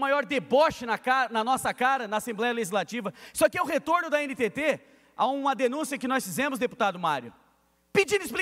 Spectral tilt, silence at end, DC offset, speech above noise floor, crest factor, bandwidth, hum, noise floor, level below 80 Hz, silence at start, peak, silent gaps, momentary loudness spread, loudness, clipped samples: -3.5 dB/octave; 0 s; under 0.1%; 40 dB; 18 dB; 16 kHz; none; -66 dBFS; -64 dBFS; 0 s; -10 dBFS; none; 5 LU; -27 LUFS; under 0.1%